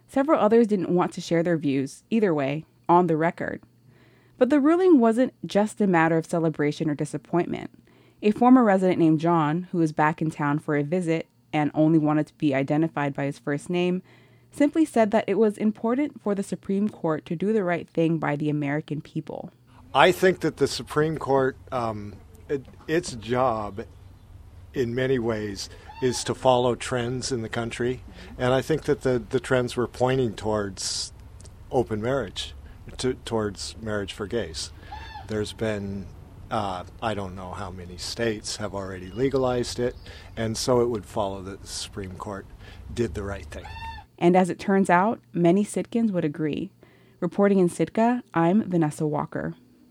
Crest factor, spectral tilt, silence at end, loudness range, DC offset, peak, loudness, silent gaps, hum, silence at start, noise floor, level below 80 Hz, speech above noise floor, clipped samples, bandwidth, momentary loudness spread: 24 dB; -6 dB/octave; 0.35 s; 8 LU; under 0.1%; 0 dBFS; -25 LUFS; none; none; 0.1 s; -56 dBFS; -50 dBFS; 32 dB; under 0.1%; 15.5 kHz; 15 LU